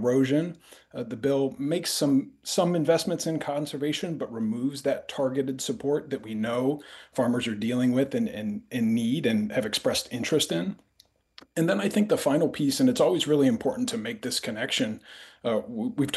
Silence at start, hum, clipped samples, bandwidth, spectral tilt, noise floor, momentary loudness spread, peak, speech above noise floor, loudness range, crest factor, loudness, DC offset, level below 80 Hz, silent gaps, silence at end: 0 s; none; under 0.1%; 12.5 kHz; -5 dB/octave; -63 dBFS; 9 LU; -10 dBFS; 37 dB; 4 LU; 16 dB; -27 LUFS; under 0.1%; -66 dBFS; none; 0 s